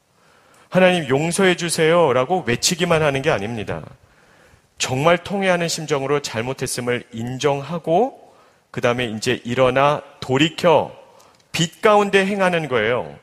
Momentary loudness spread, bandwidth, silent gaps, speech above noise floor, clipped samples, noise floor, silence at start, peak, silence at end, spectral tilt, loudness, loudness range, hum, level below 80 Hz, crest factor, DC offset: 9 LU; 15.5 kHz; none; 36 dB; under 0.1%; -55 dBFS; 0.7 s; 0 dBFS; 0.05 s; -4.5 dB/octave; -19 LUFS; 5 LU; none; -52 dBFS; 20 dB; under 0.1%